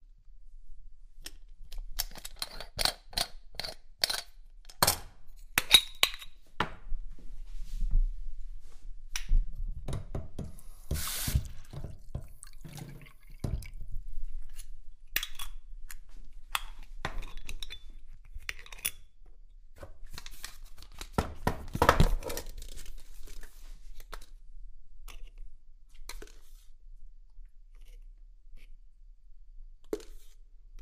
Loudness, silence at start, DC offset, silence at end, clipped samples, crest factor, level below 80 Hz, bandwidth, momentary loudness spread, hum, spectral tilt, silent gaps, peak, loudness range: -32 LUFS; 0 s; under 0.1%; 0 s; under 0.1%; 30 dB; -38 dBFS; 16 kHz; 24 LU; none; -2.5 dB/octave; none; -4 dBFS; 24 LU